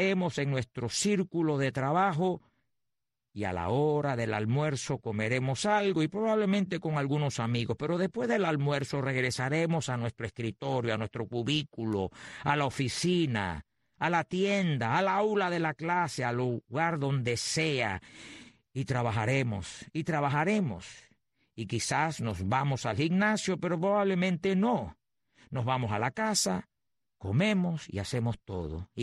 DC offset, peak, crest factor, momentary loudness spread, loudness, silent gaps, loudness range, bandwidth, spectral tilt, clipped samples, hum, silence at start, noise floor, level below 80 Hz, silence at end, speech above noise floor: under 0.1%; -14 dBFS; 16 dB; 9 LU; -30 LUFS; none; 3 LU; 12 kHz; -5.5 dB/octave; under 0.1%; none; 0 s; -88 dBFS; -60 dBFS; 0 s; 58 dB